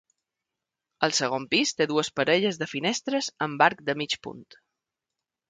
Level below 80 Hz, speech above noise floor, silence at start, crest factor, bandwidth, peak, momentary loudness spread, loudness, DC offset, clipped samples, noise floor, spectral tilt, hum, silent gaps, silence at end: -70 dBFS; 61 dB; 1 s; 24 dB; 9.6 kHz; -4 dBFS; 8 LU; -25 LUFS; under 0.1%; under 0.1%; -87 dBFS; -3 dB/octave; none; none; 1.05 s